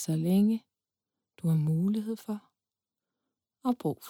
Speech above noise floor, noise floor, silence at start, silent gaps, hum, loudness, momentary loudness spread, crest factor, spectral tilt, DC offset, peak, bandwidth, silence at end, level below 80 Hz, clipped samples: over 62 dB; under -90 dBFS; 0 s; none; none; -30 LUFS; 11 LU; 14 dB; -8 dB/octave; under 0.1%; -18 dBFS; 17 kHz; 0 s; -76 dBFS; under 0.1%